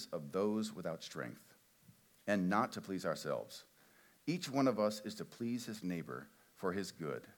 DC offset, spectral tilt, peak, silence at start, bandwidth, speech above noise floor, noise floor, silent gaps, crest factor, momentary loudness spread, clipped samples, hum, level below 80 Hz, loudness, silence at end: under 0.1%; -5.5 dB/octave; -20 dBFS; 0 s; 19 kHz; 28 dB; -67 dBFS; none; 20 dB; 14 LU; under 0.1%; none; -82 dBFS; -40 LUFS; 0.05 s